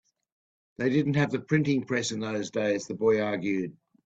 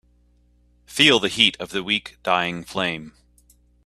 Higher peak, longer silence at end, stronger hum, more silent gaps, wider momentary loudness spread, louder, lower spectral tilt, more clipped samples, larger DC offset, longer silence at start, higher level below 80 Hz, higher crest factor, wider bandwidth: second, -10 dBFS vs 0 dBFS; second, 0.35 s vs 0.75 s; second, none vs 60 Hz at -50 dBFS; neither; second, 6 LU vs 13 LU; second, -28 LUFS vs -20 LUFS; first, -6 dB/octave vs -3 dB/octave; neither; neither; about the same, 0.8 s vs 0.9 s; second, -66 dBFS vs -56 dBFS; second, 18 dB vs 24 dB; second, 8.4 kHz vs 15.5 kHz